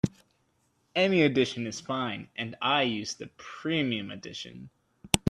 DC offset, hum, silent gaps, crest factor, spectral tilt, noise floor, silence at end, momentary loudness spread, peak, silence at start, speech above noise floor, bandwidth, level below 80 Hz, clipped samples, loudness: under 0.1%; none; none; 28 dB; -4.5 dB/octave; -71 dBFS; 0 s; 16 LU; -2 dBFS; 0.05 s; 42 dB; 14 kHz; -58 dBFS; under 0.1%; -29 LUFS